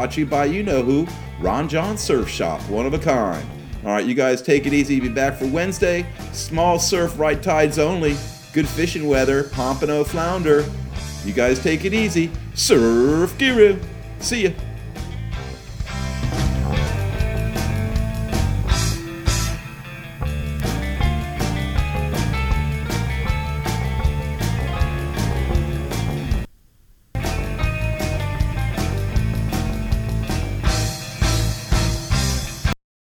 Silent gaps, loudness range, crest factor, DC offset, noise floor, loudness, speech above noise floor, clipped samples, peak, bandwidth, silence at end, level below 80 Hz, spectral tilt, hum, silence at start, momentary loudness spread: none; 6 LU; 20 dB; under 0.1%; -52 dBFS; -21 LUFS; 33 dB; under 0.1%; 0 dBFS; 19.5 kHz; 0.35 s; -28 dBFS; -5.5 dB/octave; none; 0 s; 10 LU